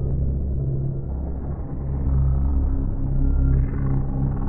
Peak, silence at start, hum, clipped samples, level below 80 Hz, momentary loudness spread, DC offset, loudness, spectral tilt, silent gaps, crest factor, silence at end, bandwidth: -8 dBFS; 0 s; none; under 0.1%; -24 dBFS; 8 LU; under 0.1%; -25 LUFS; -14 dB/octave; none; 12 dB; 0 s; 2.2 kHz